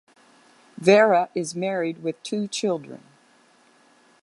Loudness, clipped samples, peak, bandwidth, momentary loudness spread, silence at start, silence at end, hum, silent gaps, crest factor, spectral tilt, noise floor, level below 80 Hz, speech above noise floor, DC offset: -22 LUFS; under 0.1%; -4 dBFS; 11.5 kHz; 14 LU; 0.8 s; 1.25 s; none; none; 20 dB; -4.5 dB/octave; -58 dBFS; -76 dBFS; 36 dB; under 0.1%